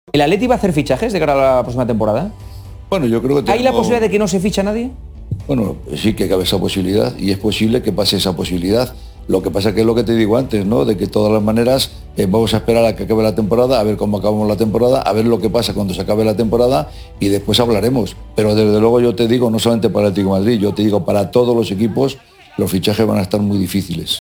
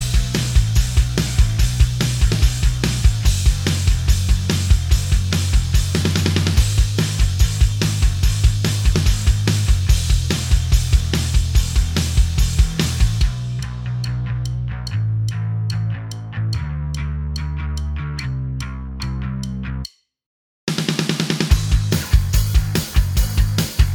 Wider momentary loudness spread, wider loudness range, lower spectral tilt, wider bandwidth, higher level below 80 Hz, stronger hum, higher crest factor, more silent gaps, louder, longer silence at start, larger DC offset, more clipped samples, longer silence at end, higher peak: about the same, 6 LU vs 8 LU; second, 2 LU vs 7 LU; first, -6 dB/octave vs -4.5 dB/octave; about the same, over 20 kHz vs 19 kHz; second, -34 dBFS vs -20 dBFS; neither; about the same, 14 dB vs 16 dB; second, none vs 20.26-20.67 s; first, -15 LUFS vs -19 LUFS; first, 0.15 s vs 0 s; neither; neither; about the same, 0 s vs 0 s; about the same, 0 dBFS vs -2 dBFS